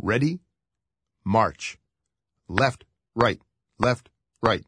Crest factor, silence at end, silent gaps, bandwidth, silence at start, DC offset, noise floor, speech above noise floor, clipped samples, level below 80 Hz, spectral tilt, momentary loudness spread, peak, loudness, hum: 24 dB; 0.1 s; none; 10.5 kHz; 0 s; under 0.1%; -86 dBFS; 63 dB; under 0.1%; -52 dBFS; -6 dB/octave; 14 LU; -2 dBFS; -25 LUFS; none